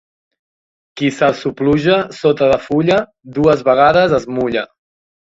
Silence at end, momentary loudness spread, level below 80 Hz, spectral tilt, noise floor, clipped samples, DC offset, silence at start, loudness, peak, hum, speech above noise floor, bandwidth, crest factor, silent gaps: 0.65 s; 9 LU; -46 dBFS; -6.5 dB/octave; under -90 dBFS; under 0.1%; under 0.1%; 0.95 s; -14 LUFS; 0 dBFS; none; over 76 dB; 8 kHz; 16 dB; none